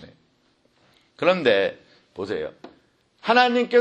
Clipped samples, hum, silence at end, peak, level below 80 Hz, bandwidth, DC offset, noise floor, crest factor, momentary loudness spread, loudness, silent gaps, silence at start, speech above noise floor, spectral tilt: under 0.1%; none; 0 s; -4 dBFS; -66 dBFS; 8.6 kHz; under 0.1%; -64 dBFS; 20 dB; 17 LU; -21 LUFS; none; 0 s; 44 dB; -5 dB/octave